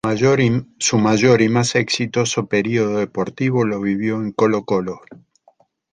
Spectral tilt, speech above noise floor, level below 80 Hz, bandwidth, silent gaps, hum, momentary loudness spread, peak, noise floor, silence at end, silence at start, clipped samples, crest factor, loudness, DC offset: -5 dB/octave; 39 dB; -54 dBFS; 10 kHz; none; none; 8 LU; -2 dBFS; -57 dBFS; 0.8 s; 0.05 s; under 0.1%; 16 dB; -18 LUFS; under 0.1%